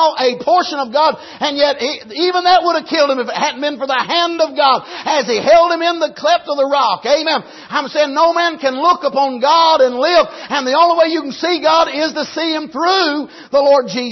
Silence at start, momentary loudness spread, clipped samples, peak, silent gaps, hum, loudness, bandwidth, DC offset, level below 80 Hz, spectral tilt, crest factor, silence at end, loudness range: 0 s; 7 LU; under 0.1%; -2 dBFS; none; none; -14 LUFS; 6.2 kHz; under 0.1%; -56 dBFS; -2.5 dB/octave; 12 dB; 0 s; 2 LU